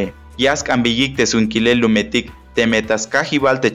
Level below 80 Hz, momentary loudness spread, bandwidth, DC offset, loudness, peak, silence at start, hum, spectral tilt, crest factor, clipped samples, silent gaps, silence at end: -42 dBFS; 5 LU; 11 kHz; under 0.1%; -16 LUFS; -2 dBFS; 0 s; none; -4 dB/octave; 14 dB; under 0.1%; none; 0 s